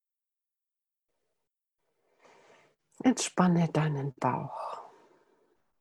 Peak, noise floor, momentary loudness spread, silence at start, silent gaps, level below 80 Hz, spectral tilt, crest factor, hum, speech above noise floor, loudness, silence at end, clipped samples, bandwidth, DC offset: -10 dBFS; -89 dBFS; 14 LU; 3.05 s; none; -72 dBFS; -5.5 dB/octave; 24 dB; none; 61 dB; -29 LUFS; 0.95 s; under 0.1%; 12 kHz; under 0.1%